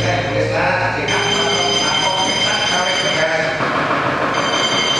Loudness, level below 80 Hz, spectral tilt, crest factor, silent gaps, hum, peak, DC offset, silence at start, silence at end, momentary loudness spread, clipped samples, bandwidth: -16 LUFS; -44 dBFS; -2.5 dB/octave; 14 dB; none; none; -4 dBFS; under 0.1%; 0 s; 0 s; 3 LU; under 0.1%; 13 kHz